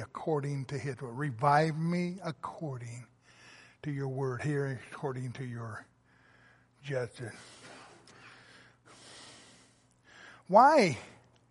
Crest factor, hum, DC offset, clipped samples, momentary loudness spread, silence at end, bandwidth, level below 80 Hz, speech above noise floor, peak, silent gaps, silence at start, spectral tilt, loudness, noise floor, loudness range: 24 dB; none; under 0.1%; under 0.1%; 24 LU; 0.4 s; 11.5 kHz; -72 dBFS; 33 dB; -10 dBFS; none; 0 s; -6.5 dB/octave; -31 LUFS; -64 dBFS; 15 LU